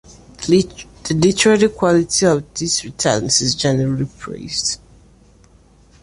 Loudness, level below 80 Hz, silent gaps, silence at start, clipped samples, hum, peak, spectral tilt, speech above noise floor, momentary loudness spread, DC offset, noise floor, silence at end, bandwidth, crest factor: -17 LUFS; -46 dBFS; none; 0.1 s; under 0.1%; none; -2 dBFS; -4 dB/octave; 33 dB; 13 LU; under 0.1%; -49 dBFS; 1.25 s; 11.5 kHz; 16 dB